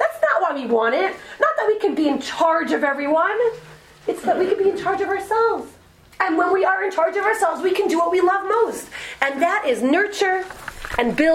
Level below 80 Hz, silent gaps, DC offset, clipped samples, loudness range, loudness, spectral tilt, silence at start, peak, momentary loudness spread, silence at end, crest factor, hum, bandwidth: -52 dBFS; none; under 0.1%; under 0.1%; 2 LU; -20 LUFS; -4 dB/octave; 0 s; 0 dBFS; 7 LU; 0 s; 20 dB; none; 16 kHz